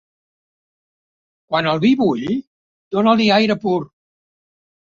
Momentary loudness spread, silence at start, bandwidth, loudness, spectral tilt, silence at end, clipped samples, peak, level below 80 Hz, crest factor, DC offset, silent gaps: 11 LU; 1.5 s; 7.4 kHz; -17 LUFS; -6.5 dB/octave; 1.05 s; under 0.1%; -2 dBFS; -60 dBFS; 18 dB; under 0.1%; 2.47-2.91 s